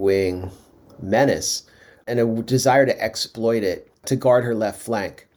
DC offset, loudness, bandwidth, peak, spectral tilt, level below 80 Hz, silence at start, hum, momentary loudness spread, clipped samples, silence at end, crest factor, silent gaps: under 0.1%; -21 LUFS; over 20 kHz; -4 dBFS; -4.5 dB/octave; -56 dBFS; 0 s; none; 12 LU; under 0.1%; 0.25 s; 18 dB; none